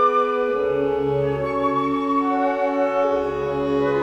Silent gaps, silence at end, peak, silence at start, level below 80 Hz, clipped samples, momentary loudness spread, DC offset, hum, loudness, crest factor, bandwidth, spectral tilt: none; 0 s; -8 dBFS; 0 s; -48 dBFS; under 0.1%; 2 LU; under 0.1%; none; -21 LUFS; 12 dB; 7.8 kHz; -7.5 dB/octave